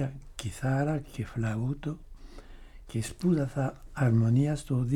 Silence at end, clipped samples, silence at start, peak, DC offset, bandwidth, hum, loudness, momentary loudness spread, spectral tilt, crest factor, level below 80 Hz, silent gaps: 0 s; under 0.1%; 0 s; -14 dBFS; under 0.1%; 13 kHz; none; -30 LUFS; 12 LU; -7.5 dB/octave; 16 dB; -48 dBFS; none